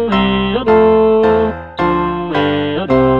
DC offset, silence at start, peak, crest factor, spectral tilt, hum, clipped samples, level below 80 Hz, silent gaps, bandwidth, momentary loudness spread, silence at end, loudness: 0.8%; 0 s; 0 dBFS; 12 dB; -8.5 dB/octave; none; under 0.1%; -34 dBFS; none; 5.6 kHz; 7 LU; 0 s; -13 LUFS